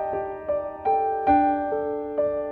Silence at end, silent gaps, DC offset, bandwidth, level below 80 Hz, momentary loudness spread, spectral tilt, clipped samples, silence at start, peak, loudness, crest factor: 0 s; none; under 0.1%; 4.3 kHz; -52 dBFS; 8 LU; -9.5 dB/octave; under 0.1%; 0 s; -8 dBFS; -24 LUFS; 16 dB